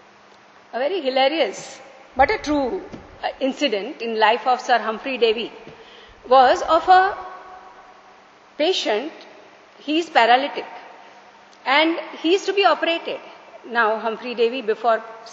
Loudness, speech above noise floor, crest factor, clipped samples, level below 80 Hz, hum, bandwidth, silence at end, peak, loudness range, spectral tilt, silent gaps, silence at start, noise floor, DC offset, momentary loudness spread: -20 LUFS; 30 dB; 20 dB; under 0.1%; -54 dBFS; none; 8 kHz; 0 s; 0 dBFS; 4 LU; 0 dB/octave; none; 0.75 s; -49 dBFS; under 0.1%; 18 LU